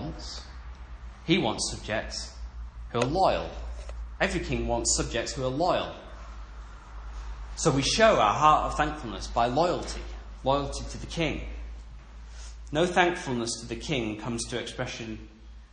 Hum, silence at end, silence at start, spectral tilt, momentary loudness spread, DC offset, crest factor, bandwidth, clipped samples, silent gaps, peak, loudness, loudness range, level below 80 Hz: none; 0.05 s; 0 s; -4 dB/octave; 22 LU; under 0.1%; 24 dB; 10.5 kHz; under 0.1%; none; -6 dBFS; -27 LUFS; 6 LU; -40 dBFS